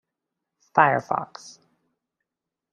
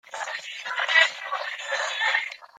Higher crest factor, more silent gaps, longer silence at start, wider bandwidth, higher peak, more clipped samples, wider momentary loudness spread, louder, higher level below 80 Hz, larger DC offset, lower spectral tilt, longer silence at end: about the same, 26 dB vs 22 dB; neither; first, 0.75 s vs 0.05 s; second, 10.5 kHz vs 14 kHz; about the same, -2 dBFS vs -4 dBFS; neither; first, 20 LU vs 13 LU; about the same, -22 LUFS vs -24 LUFS; first, -70 dBFS vs -86 dBFS; neither; first, -5.5 dB/octave vs 3.5 dB/octave; first, 1.25 s vs 0.15 s